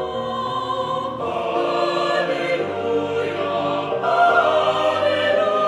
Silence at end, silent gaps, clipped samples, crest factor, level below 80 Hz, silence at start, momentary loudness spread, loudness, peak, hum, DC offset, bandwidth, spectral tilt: 0 s; none; under 0.1%; 16 dB; -58 dBFS; 0 s; 8 LU; -20 LUFS; -4 dBFS; none; under 0.1%; 11 kHz; -5 dB/octave